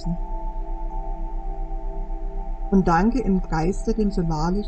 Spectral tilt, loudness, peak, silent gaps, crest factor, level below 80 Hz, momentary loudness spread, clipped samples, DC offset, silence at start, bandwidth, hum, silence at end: -7.5 dB/octave; -25 LUFS; -6 dBFS; none; 16 dB; -26 dBFS; 15 LU; under 0.1%; under 0.1%; 0 s; 8.6 kHz; none; 0 s